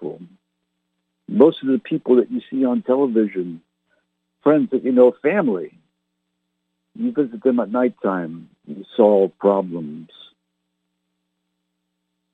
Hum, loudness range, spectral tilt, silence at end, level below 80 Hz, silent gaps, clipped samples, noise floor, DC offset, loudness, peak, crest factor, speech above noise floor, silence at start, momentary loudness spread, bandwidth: none; 4 LU; -9.5 dB/octave; 2.3 s; -72 dBFS; none; under 0.1%; -76 dBFS; under 0.1%; -19 LUFS; -2 dBFS; 20 dB; 57 dB; 0 s; 18 LU; 4 kHz